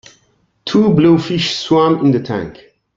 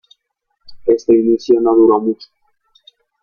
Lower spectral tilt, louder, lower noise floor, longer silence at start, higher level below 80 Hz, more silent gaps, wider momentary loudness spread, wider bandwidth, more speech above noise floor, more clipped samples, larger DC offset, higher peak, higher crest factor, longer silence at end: about the same, -6.5 dB/octave vs -7 dB/octave; about the same, -14 LUFS vs -13 LUFS; second, -58 dBFS vs -71 dBFS; about the same, 0.65 s vs 0.7 s; about the same, -50 dBFS vs -54 dBFS; neither; about the same, 12 LU vs 11 LU; first, 7.8 kHz vs 6.8 kHz; second, 46 dB vs 59 dB; neither; neither; about the same, -2 dBFS vs -2 dBFS; about the same, 14 dB vs 14 dB; second, 0.45 s vs 1 s